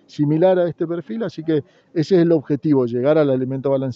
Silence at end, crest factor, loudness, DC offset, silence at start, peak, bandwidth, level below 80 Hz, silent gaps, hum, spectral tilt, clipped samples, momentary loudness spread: 0 s; 14 dB; -19 LUFS; under 0.1%; 0.15 s; -4 dBFS; 7.4 kHz; -64 dBFS; none; none; -9 dB/octave; under 0.1%; 9 LU